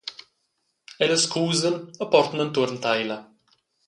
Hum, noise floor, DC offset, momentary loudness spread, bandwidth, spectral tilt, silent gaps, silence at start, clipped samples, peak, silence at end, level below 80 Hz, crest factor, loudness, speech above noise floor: none; -74 dBFS; under 0.1%; 10 LU; 11.5 kHz; -3.5 dB/octave; none; 0.05 s; under 0.1%; -4 dBFS; 0.65 s; -70 dBFS; 20 dB; -23 LUFS; 51 dB